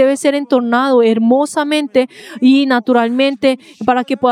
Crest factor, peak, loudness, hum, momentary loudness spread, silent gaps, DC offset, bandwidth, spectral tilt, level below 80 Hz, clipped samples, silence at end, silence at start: 12 dB; 0 dBFS; -13 LUFS; none; 5 LU; none; under 0.1%; 12.5 kHz; -4.5 dB/octave; -64 dBFS; under 0.1%; 0 s; 0 s